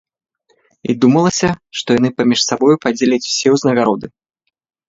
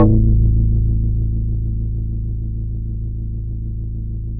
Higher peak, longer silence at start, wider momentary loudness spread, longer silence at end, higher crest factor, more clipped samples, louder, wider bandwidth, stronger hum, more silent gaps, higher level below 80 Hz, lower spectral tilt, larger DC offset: about the same, 0 dBFS vs 0 dBFS; first, 0.85 s vs 0 s; about the same, 10 LU vs 11 LU; first, 0.8 s vs 0 s; about the same, 16 dB vs 16 dB; neither; first, -14 LUFS vs -21 LUFS; first, 7.8 kHz vs 1.3 kHz; neither; neither; second, -52 dBFS vs -20 dBFS; second, -4.5 dB/octave vs -15 dB/octave; neither